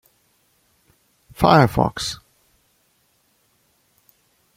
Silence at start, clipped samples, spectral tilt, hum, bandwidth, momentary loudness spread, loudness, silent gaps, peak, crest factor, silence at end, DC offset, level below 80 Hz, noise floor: 1.4 s; under 0.1%; -6 dB/octave; none; 16.5 kHz; 14 LU; -18 LUFS; none; -2 dBFS; 22 dB; 2.4 s; under 0.1%; -46 dBFS; -64 dBFS